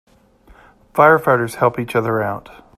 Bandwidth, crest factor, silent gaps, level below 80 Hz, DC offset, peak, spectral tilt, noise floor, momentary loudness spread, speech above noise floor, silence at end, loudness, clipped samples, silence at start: 15 kHz; 18 dB; none; -54 dBFS; under 0.1%; 0 dBFS; -6.5 dB/octave; -50 dBFS; 13 LU; 34 dB; 0.4 s; -16 LUFS; under 0.1%; 0.95 s